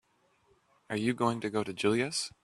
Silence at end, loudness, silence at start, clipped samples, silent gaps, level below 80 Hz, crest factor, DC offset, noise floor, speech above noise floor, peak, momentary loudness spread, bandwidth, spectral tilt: 0.15 s; -31 LUFS; 0.9 s; under 0.1%; none; -70 dBFS; 20 dB; under 0.1%; -70 dBFS; 38 dB; -12 dBFS; 5 LU; 13 kHz; -4.5 dB/octave